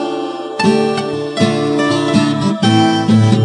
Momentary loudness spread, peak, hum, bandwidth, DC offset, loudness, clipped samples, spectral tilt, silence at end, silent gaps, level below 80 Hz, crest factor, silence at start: 8 LU; 0 dBFS; none; 10.5 kHz; under 0.1%; -14 LUFS; under 0.1%; -6 dB/octave; 0 s; none; -54 dBFS; 14 dB; 0 s